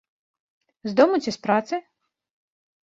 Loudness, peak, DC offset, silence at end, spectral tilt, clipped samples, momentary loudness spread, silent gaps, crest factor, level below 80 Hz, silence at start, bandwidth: -22 LUFS; -4 dBFS; under 0.1%; 1.05 s; -5.5 dB/octave; under 0.1%; 13 LU; none; 22 dB; -68 dBFS; 0.85 s; 8 kHz